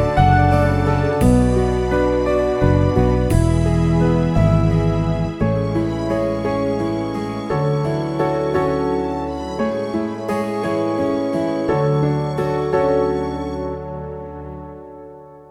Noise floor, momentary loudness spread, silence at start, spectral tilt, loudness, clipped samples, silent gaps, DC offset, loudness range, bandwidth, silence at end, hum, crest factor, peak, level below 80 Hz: -39 dBFS; 11 LU; 0 s; -8 dB/octave; -19 LUFS; under 0.1%; none; under 0.1%; 4 LU; 14 kHz; 0.05 s; none; 18 dB; 0 dBFS; -28 dBFS